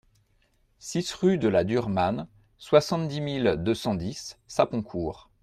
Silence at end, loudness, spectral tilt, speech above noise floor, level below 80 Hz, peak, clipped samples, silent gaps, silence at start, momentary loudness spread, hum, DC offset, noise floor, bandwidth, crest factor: 0.25 s; -26 LUFS; -6 dB/octave; 41 dB; -56 dBFS; -6 dBFS; under 0.1%; none; 0.85 s; 13 LU; none; under 0.1%; -67 dBFS; 14.5 kHz; 22 dB